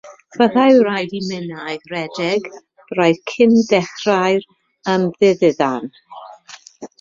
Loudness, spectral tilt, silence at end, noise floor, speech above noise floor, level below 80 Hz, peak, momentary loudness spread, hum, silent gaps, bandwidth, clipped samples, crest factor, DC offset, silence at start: -17 LUFS; -5.5 dB/octave; 0.15 s; -42 dBFS; 26 dB; -60 dBFS; -2 dBFS; 21 LU; none; none; 7.6 kHz; under 0.1%; 16 dB; under 0.1%; 0.05 s